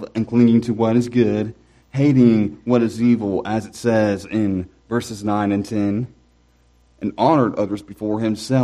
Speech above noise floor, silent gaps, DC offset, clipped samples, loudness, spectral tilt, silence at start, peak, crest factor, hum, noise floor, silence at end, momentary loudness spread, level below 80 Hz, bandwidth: 38 dB; none; under 0.1%; under 0.1%; -19 LUFS; -7.5 dB/octave; 0 s; -2 dBFS; 18 dB; 60 Hz at -40 dBFS; -56 dBFS; 0 s; 11 LU; -52 dBFS; 12 kHz